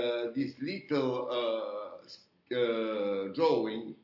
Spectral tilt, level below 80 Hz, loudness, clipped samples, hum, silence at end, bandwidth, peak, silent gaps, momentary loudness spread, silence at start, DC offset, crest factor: -7 dB/octave; -80 dBFS; -32 LUFS; under 0.1%; none; 0.1 s; 6 kHz; -16 dBFS; none; 15 LU; 0 s; under 0.1%; 18 dB